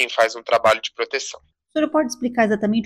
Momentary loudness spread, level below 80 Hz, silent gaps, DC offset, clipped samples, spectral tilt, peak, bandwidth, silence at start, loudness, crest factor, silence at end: 9 LU; -58 dBFS; none; under 0.1%; under 0.1%; -4 dB/octave; -4 dBFS; 15 kHz; 0 s; -20 LUFS; 16 dB; 0 s